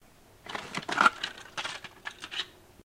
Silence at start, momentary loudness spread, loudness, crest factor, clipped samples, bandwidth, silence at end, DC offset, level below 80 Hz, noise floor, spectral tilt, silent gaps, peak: 0.45 s; 17 LU; -31 LUFS; 26 dB; under 0.1%; 16 kHz; 0 s; under 0.1%; -66 dBFS; -51 dBFS; -2 dB/octave; none; -6 dBFS